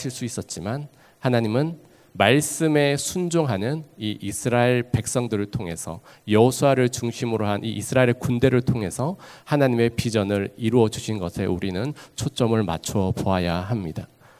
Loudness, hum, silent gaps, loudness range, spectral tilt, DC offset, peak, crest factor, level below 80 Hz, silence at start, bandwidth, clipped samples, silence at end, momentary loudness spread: -23 LUFS; none; none; 3 LU; -5.5 dB/octave; under 0.1%; -2 dBFS; 22 dB; -46 dBFS; 0 s; 16 kHz; under 0.1%; 0.35 s; 11 LU